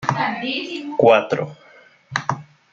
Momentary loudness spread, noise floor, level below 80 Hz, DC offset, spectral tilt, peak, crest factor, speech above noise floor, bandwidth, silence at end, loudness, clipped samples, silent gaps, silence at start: 13 LU; -43 dBFS; -64 dBFS; under 0.1%; -5.5 dB/octave; -2 dBFS; 20 dB; 24 dB; 7.6 kHz; 0.3 s; -20 LUFS; under 0.1%; none; 0 s